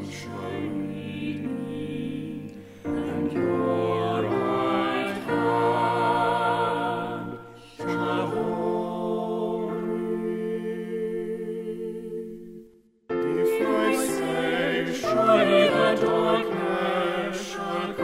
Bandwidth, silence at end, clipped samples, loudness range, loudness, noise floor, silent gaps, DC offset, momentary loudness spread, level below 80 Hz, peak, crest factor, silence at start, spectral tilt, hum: 16 kHz; 0 s; under 0.1%; 8 LU; -26 LUFS; -52 dBFS; none; under 0.1%; 12 LU; -60 dBFS; -8 dBFS; 18 dB; 0 s; -5.5 dB/octave; none